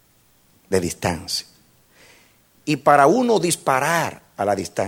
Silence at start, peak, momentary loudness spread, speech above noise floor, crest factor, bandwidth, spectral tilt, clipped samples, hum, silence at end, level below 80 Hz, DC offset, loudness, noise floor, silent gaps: 0.7 s; -2 dBFS; 12 LU; 39 dB; 20 dB; 17 kHz; -4 dB/octave; under 0.1%; none; 0 s; -54 dBFS; under 0.1%; -20 LUFS; -58 dBFS; none